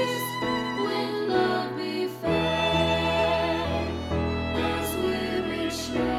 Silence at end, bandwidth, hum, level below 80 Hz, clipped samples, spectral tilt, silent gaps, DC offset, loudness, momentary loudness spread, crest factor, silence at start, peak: 0 s; 16.5 kHz; none; -42 dBFS; under 0.1%; -5 dB/octave; none; under 0.1%; -26 LUFS; 6 LU; 16 dB; 0 s; -12 dBFS